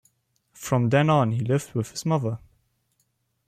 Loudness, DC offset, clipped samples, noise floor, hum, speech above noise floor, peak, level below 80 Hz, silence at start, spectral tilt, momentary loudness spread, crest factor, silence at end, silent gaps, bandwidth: -24 LUFS; under 0.1%; under 0.1%; -72 dBFS; none; 49 dB; -8 dBFS; -60 dBFS; 0.6 s; -6.5 dB/octave; 12 LU; 18 dB; 1.1 s; none; 15 kHz